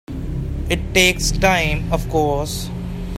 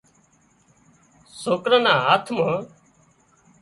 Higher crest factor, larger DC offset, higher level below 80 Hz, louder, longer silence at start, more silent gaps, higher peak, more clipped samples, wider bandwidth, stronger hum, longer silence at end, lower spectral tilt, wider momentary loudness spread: about the same, 20 dB vs 20 dB; neither; first, -28 dBFS vs -64 dBFS; about the same, -19 LUFS vs -20 LUFS; second, 0.1 s vs 1.35 s; neither; first, 0 dBFS vs -4 dBFS; neither; first, 16 kHz vs 11.5 kHz; neither; second, 0 s vs 0.95 s; about the same, -4 dB/octave vs -4.5 dB/octave; about the same, 12 LU vs 14 LU